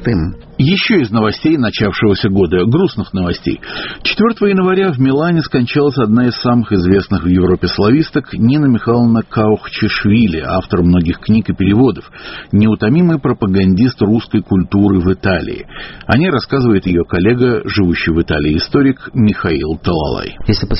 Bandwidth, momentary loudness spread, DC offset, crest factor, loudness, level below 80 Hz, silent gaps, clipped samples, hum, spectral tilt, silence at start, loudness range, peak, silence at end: 6 kHz; 6 LU; under 0.1%; 12 dB; -13 LUFS; -32 dBFS; none; under 0.1%; none; -6 dB/octave; 0 s; 1 LU; 0 dBFS; 0 s